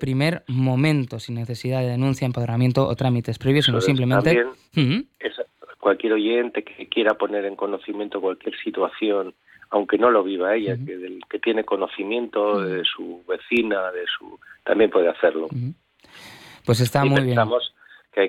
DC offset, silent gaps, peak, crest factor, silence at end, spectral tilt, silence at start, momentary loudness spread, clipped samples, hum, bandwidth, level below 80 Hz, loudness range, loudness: under 0.1%; none; -6 dBFS; 16 dB; 0 s; -6.5 dB/octave; 0 s; 12 LU; under 0.1%; none; 14.5 kHz; -58 dBFS; 4 LU; -22 LUFS